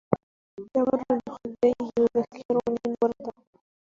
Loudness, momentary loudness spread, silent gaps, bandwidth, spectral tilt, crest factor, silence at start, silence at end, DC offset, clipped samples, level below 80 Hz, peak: -27 LUFS; 13 LU; 0.23-0.57 s, 2.45-2.49 s; 7.2 kHz; -8.5 dB/octave; 22 dB; 0.1 s; 0.6 s; under 0.1%; under 0.1%; -62 dBFS; -4 dBFS